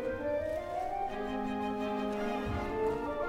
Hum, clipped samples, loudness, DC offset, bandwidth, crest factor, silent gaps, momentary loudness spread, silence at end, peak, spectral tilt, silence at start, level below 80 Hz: none; under 0.1%; -35 LUFS; under 0.1%; 16 kHz; 12 dB; none; 3 LU; 0 s; -22 dBFS; -6.5 dB/octave; 0 s; -50 dBFS